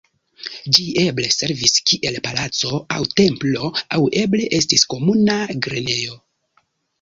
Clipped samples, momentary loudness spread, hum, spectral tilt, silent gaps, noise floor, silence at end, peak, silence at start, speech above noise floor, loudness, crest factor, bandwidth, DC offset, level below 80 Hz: under 0.1%; 8 LU; none; -3.5 dB/octave; none; -64 dBFS; 0.85 s; 0 dBFS; 0.4 s; 45 dB; -17 LUFS; 20 dB; 16 kHz; under 0.1%; -52 dBFS